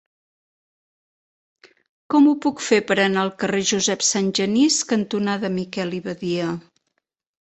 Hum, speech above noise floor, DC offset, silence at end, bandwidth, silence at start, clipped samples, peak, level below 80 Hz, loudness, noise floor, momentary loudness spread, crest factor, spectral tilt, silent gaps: none; 56 dB; under 0.1%; 0.8 s; 8.4 kHz; 2.1 s; under 0.1%; -2 dBFS; -62 dBFS; -20 LUFS; -76 dBFS; 9 LU; 20 dB; -3.5 dB/octave; none